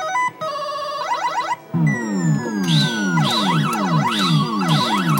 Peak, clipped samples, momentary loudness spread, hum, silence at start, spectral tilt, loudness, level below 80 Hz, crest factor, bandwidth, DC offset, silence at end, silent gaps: -6 dBFS; under 0.1%; 7 LU; none; 0 s; -5 dB/octave; -19 LUFS; -62 dBFS; 14 dB; 16.5 kHz; under 0.1%; 0 s; none